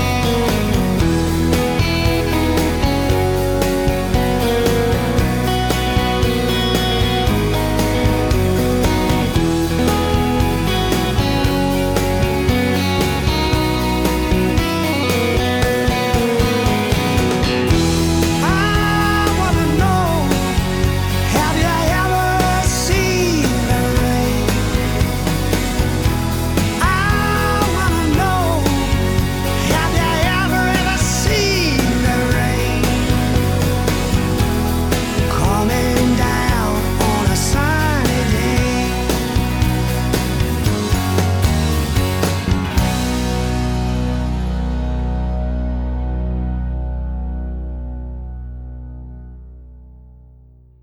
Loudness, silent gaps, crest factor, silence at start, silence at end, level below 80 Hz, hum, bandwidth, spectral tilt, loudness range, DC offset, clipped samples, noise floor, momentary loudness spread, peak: -17 LUFS; none; 12 dB; 0 s; 0.75 s; -24 dBFS; none; 19.5 kHz; -5 dB/octave; 5 LU; under 0.1%; under 0.1%; -45 dBFS; 6 LU; -4 dBFS